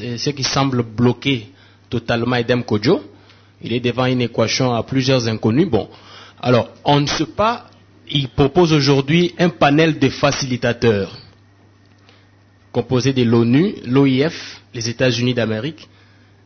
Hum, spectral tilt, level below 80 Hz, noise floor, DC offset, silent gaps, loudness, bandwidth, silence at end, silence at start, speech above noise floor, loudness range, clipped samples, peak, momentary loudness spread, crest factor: none; -5.5 dB/octave; -46 dBFS; -51 dBFS; under 0.1%; none; -17 LUFS; 6.6 kHz; 0.6 s; 0 s; 34 dB; 4 LU; under 0.1%; -2 dBFS; 11 LU; 16 dB